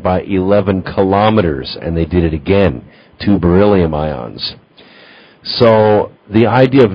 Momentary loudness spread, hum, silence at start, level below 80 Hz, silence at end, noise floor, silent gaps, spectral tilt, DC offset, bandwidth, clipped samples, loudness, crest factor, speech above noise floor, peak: 12 LU; none; 0 s; -30 dBFS; 0 s; -41 dBFS; none; -9.5 dB/octave; under 0.1%; 5.6 kHz; 0.2%; -13 LUFS; 12 dB; 29 dB; 0 dBFS